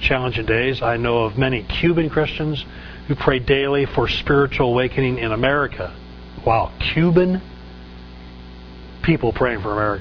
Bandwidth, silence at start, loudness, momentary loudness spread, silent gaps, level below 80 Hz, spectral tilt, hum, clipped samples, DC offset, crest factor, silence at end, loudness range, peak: 5.4 kHz; 0 s; -19 LUFS; 22 LU; none; -34 dBFS; -8 dB/octave; none; under 0.1%; under 0.1%; 20 dB; 0 s; 3 LU; 0 dBFS